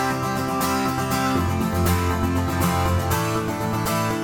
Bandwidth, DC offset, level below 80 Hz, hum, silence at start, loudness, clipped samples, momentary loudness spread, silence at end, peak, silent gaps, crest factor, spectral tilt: 18 kHz; under 0.1%; -38 dBFS; none; 0 s; -22 LUFS; under 0.1%; 3 LU; 0 s; -8 dBFS; none; 14 dB; -5.5 dB/octave